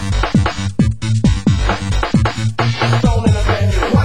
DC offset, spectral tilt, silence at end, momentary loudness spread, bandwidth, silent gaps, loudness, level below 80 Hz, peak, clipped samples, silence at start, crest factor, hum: 3%; -6.5 dB/octave; 0 s; 4 LU; 16 kHz; none; -16 LUFS; -22 dBFS; 0 dBFS; under 0.1%; 0 s; 14 dB; none